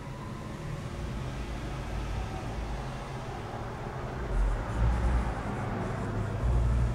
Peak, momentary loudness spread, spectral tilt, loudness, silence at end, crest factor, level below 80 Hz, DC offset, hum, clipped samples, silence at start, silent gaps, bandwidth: -16 dBFS; 9 LU; -7 dB/octave; -34 LUFS; 0 s; 14 dB; -34 dBFS; under 0.1%; none; under 0.1%; 0 s; none; 11 kHz